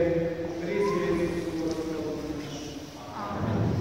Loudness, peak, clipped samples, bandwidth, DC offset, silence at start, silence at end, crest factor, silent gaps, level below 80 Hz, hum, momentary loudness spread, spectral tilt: -30 LUFS; -14 dBFS; under 0.1%; 16 kHz; 0.2%; 0 s; 0 s; 16 dB; none; -50 dBFS; none; 11 LU; -6.5 dB/octave